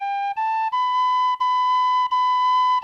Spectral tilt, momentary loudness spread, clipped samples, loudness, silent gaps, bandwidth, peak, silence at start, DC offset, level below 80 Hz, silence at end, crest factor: 3 dB/octave; 5 LU; under 0.1%; -20 LUFS; none; 7 kHz; -14 dBFS; 0 s; under 0.1%; -78 dBFS; 0 s; 6 dB